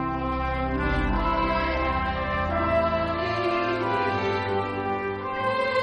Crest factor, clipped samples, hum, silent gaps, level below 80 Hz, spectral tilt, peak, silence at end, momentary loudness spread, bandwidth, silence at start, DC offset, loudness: 14 dB; under 0.1%; none; none; -34 dBFS; -7 dB/octave; -12 dBFS; 0 s; 4 LU; 9.8 kHz; 0 s; under 0.1%; -26 LUFS